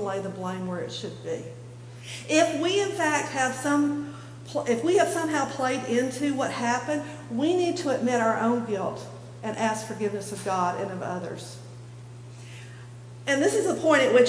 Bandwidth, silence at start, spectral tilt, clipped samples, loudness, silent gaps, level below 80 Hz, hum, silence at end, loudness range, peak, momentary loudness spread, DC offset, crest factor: 11 kHz; 0 s; -4.5 dB/octave; under 0.1%; -26 LUFS; none; -66 dBFS; 60 Hz at -45 dBFS; 0 s; 5 LU; -8 dBFS; 20 LU; under 0.1%; 18 dB